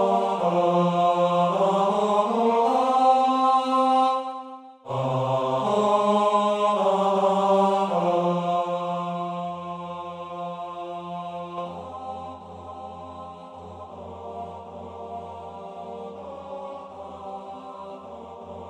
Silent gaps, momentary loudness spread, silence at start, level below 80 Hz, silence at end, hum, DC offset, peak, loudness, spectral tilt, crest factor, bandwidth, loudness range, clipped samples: none; 19 LU; 0 s; -64 dBFS; 0 s; none; under 0.1%; -8 dBFS; -23 LUFS; -6.5 dB/octave; 16 dB; 11.5 kHz; 17 LU; under 0.1%